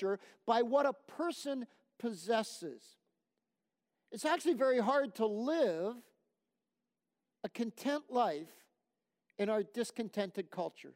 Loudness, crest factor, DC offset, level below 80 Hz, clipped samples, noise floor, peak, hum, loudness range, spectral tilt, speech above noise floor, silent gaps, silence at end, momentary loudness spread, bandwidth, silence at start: -36 LUFS; 20 dB; under 0.1%; -90 dBFS; under 0.1%; -90 dBFS; -18 dBFS; none; 6 LU; -4.5 dB/octave; 54 dB; none; 0.05 s; 16 LU; 16 kHz; 0 s